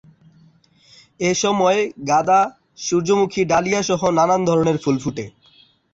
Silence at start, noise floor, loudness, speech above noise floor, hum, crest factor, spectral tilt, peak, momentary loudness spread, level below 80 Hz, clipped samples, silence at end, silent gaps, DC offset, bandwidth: 1.2 s; -54 dBFS; -18 LUFS; 36 dB; none; 14 dB; -4.5 dB/octave; -4 dBFS; 8 LU; -54 dBFS; under 0.1%; 0.65 s; none; under 0.1%; 8 kHz